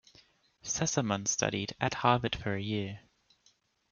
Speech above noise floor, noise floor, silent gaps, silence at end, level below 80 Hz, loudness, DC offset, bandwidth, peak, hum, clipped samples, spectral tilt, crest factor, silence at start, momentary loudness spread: 38 dB; -70 dBFS; none; 0.9 s; -60 dBFS; -31 LUFS; under 0.1%; 10.5 kHz; -10 dBFS; none; under 0.1%; -3.5 dB/octave; 24 dB; 0.65 s; 10 LU